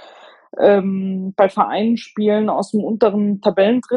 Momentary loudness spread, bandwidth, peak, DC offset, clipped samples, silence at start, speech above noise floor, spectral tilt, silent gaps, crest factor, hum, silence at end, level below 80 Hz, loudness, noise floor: 7 LU; 10 kHz; -2 dBFS; under 0.1%; under 0.1%; 0.55 s; 28 dB; -7.5 dB/octave; none; 16 dB; none; 0 s; -62 dBFS; -17 LUFS; -44 dBFS